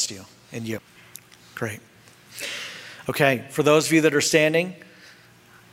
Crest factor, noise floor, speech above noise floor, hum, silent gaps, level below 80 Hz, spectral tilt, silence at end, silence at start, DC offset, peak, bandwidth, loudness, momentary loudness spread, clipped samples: 22 dB; -52 dBFS; 30 dB; none; none; -66 dBFS; -4 dB/octave; 0.9 s; 0 s; under 0.1%; -2 dBFS; 16 kHz; -22 LUFS; 24 LU; under 0.1%